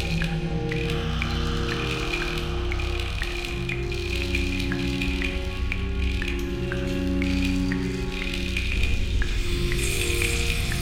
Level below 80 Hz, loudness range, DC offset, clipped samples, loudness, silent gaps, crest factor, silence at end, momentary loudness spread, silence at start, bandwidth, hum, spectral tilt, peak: -28 dBFS; 1 LU; under 0.1%; under 0.1%; -27 LUFS; none; 16 dB; 0 s; 4 LU; 0 s; 16.5 kHz; none; -5 dB/octave; -8 dBFS